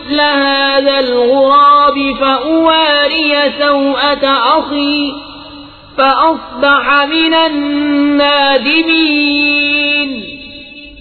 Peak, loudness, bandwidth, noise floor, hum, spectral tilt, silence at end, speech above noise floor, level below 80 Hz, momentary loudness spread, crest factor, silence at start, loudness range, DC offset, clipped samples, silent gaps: 0 dBFS; -10 LUFS; 4.6 kHz; -33 dBFS; none; -5.5 dB/octave; 0 s; 22 dB; -44 dBFS; 10 LU; 12 dB; 0 s; 3 LU; under 0.1%; under 0.1%; none